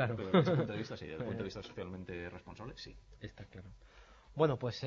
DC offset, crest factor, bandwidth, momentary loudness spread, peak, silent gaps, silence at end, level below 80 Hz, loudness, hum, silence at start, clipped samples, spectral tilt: under 0.1%; 22 dB; 7.4 kHz; 21 LU; -14 dBFS; none; 0 s; -62 dBFS; -36 LUFS; none; 0 s; under 0.1%; -6 dB/octave